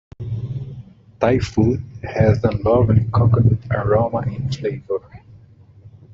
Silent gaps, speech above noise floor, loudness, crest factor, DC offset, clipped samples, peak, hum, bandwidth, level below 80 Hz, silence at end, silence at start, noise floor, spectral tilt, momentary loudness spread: none; 29 dB; -19 LUFS; 16 dB; under 0.1%; under 0.1%; -2 dBFS; none; 7.4 kHz; -40 dBFS; 0.25 s; 0.2 s; -46 dBFS; -8.5 dB/octave; 13 LU